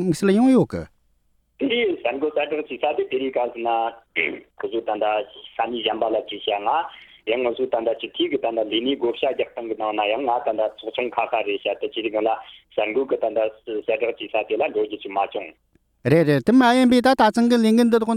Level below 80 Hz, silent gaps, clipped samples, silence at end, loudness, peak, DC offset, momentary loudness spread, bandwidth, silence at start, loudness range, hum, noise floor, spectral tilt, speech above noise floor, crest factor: -58 dBFS; none; under 0.1%; 0 s; -22 LUFS; -4 dBFS; under 0.1%; 11 LU; 14 kHz; 0 s; 5 LU; none; -64 dBFS; -6 dB/octave; 43 dB; 16 dB